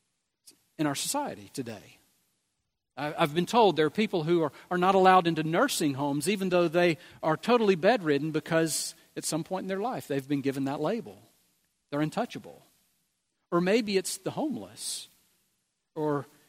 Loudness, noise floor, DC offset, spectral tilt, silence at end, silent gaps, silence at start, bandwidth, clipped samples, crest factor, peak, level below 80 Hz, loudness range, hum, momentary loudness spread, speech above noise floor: -28 LUFS; -81 dBFS; under 0.1%; -4.5 dB/octave; 0.25 s; none; 0.8 s; 16 kHz; under 0.1%; 22 dB; -6 dBFS; -72 dBFS; 8 LU; none; 13 LU; 54 dB